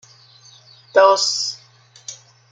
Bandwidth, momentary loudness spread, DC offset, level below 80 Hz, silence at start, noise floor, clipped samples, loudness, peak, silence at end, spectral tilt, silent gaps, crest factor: 9.4 kHz; 23 LU; under 0.1%; -74 dBFS; 0.95 s; -50 dBFS; under 0.1%; -16 LUFS; -2 dBFS; 0.35 s; 0 dB/octave; none; 20 dB